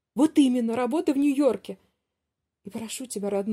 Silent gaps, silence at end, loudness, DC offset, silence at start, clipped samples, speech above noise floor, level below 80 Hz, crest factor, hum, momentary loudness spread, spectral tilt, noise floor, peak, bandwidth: none; 0 s; -25 LUFS; under 0.1%; 0.15 s; under 0.1%; 60 dB; -72 dBFS; 16 dB; none; 18 LU; -5 dB/octave; -84 dBFS; -10 dBFS; 14 kHz